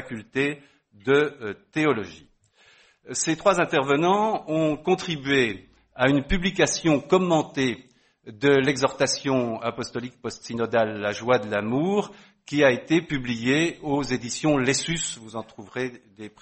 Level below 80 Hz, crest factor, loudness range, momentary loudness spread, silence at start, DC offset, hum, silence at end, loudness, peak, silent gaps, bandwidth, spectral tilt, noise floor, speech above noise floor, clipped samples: -46 dBFS; 20 dB; 3 LU; 13 LU; 0 s; under 0.1%; none; 0.15 s; -24 LUFS; -4 dBFS; none; 8.8 kHz; -4.5 dB/octave; -58 dBFS; 34 dB; under 0.1%